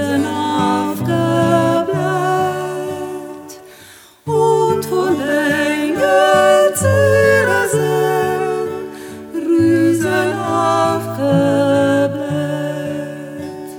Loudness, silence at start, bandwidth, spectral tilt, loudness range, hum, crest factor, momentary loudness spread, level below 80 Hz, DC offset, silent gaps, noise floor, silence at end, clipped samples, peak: -15 LUFS; 0 s; 19.5 kHz; -5.5 dB/octave; 5 LU; none; 14 dB; 15 LU; -58 dBFS; under 0.1%; none; -42 dBFS; 0 s; under 0.1%; 0 dBFS